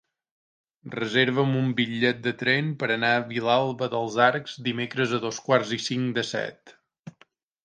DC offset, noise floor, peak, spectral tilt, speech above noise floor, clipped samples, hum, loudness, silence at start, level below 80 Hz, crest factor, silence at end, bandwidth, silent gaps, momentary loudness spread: under 0.1%; -61 dBFS; -4 dBFS; -5 dB/octave; 37 dB; under 0.1%; none; -25 LUFS; 0.85 s; -70 dBFS; 22 dB; 0.55 s; 9.6 kHz; 6.99-7.03 s; 8 LU